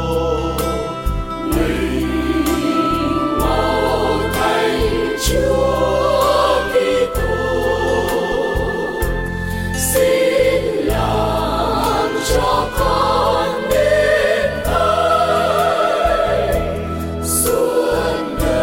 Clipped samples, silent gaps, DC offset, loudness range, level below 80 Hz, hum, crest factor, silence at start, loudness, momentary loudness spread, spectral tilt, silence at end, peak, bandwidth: under 0.1%; none; under 0.1%; 3 LU; -28 dBFS; none; 12 dB; 0 s; -17 LUFS; 6 LU; -4.5 dB/octave; 0 s; -4 dBFS; 17 kHz